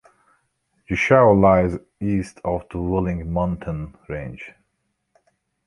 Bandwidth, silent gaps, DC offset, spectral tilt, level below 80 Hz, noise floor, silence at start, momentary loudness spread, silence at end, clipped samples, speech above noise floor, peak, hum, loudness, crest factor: 11 kHz; none; under 0.1%; -8 dB/octave; -40 dBFS; -73 dBFS; 0.9 s; 18 LU; 1.15 s; under 0.1%; 53 dB; -2 dBFS; none; -20 LUFS; 20 dB